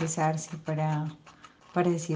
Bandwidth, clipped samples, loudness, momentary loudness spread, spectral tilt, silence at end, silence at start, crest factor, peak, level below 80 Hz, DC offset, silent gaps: 9.8 kHz; under 0.1%; -30 LUFS; 9 LU; -6 dB/octave; 0 s; 0 s; 18 dB; -12 dBFS; -70 dBFS; under 0.1%; none